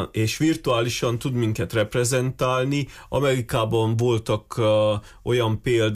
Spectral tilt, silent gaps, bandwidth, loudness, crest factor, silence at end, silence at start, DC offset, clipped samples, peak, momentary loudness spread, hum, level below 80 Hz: -5.5 dB/octave; none; 15.5 kHz; -23 LUFS; 12 dB; 0 s; 0 s; under 0.1%; under 0.1%; -10 dBFS; 4 LU; none; -46 dBFS